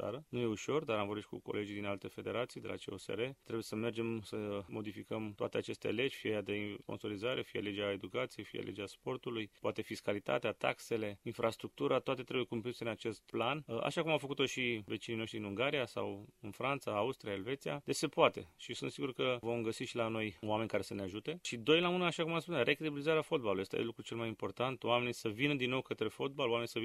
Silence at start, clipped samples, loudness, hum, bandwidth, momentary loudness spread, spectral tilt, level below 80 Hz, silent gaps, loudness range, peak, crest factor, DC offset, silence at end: 0 s; under 0.1%; -38 LUFS; none; 14.5 kHz; 9 LU; -5 dB/octave; -74 dBFS; none; 6 LU; -14 dBFS; 24 dB; under 0.1%; 0 s